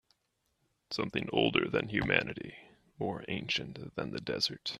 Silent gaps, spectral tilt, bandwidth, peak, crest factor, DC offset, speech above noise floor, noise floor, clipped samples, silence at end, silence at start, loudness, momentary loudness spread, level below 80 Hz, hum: none; -5 dB/octave; 13.5 kHz; -8 dBFS; 26 dB; under 0.1%; 45 dB; -79 dBFS; under 0.1%; 0 s; 0.9 s; -33 LUFS; 12 LU; -60 dBFS; none